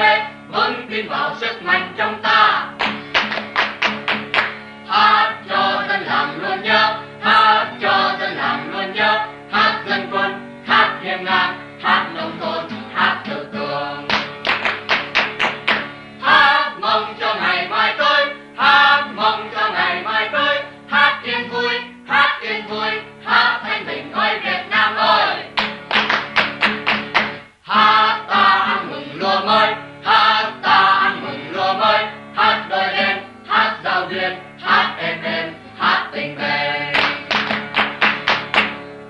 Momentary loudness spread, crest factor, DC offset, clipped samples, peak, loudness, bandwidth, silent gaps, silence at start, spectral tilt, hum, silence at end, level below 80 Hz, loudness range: 10 LU; 18 dB; under 0.1%; under 0.1%; 0 dBFS; -17 LUFS; 10.5 kHz; none; 0 s; -4 dB/octave; none; 0 s; -58 dBFS; 4 LU